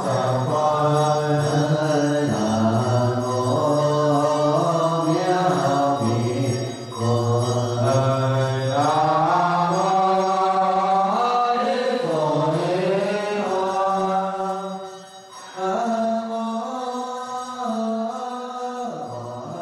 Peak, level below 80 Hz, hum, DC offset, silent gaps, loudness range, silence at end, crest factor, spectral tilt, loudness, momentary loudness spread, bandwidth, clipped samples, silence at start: -8 dBFS; -60 dBFS; none; under 0.1%; none; 7 LU; 0 s; 14 dB; -6.5 dB/octave; -21 LUFS; 10 LU; 13 kHz; under 0.1%; 0 s